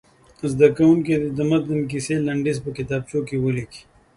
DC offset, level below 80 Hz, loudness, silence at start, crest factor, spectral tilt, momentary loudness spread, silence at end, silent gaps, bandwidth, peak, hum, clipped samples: under 0.1%; -52 dBFS; -21 LUFS; 0.4 s; 20 dB; -7 dB/octave; 11 LU; 0.35 s; none; 11.5 kHz; -2 dBFS; none; under 0.1%